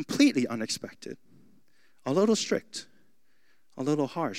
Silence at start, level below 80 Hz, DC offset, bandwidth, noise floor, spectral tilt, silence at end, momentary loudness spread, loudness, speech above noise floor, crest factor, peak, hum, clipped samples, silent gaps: 0 s; -80 dBFS; 0.2%; 15 kHz; -71 dBFS; -4.5 dB/octave; 0 s; 19 LU; -28 LUFS; 44 dB; 20 dB; -10 dBFS; none; under 0.1%; none